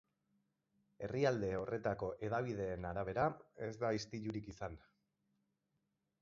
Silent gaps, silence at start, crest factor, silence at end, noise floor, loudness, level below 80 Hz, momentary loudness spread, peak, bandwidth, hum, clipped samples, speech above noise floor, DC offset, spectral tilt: none; 1 s; 20 dB; 1.45 s; -85 dBFS; -41 LUFS; -64 dBFS; 12 LU; -22 dBFS; 7.4 kHz; none; under 0.1%; 45 dB; under 0.1%; -6 dB/octave